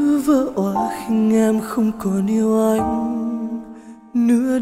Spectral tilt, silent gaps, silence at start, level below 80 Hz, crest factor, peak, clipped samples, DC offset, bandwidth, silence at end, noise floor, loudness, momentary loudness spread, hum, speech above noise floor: -7 dB/octave; none; 0 s; -48 dBFS; 14 dB; -4 dBFS; under 0.1%; under 0.1%; 15.5 kHz; 0 s; -39 dBFS; -19 LUFS; 9 LU; none; 22 dB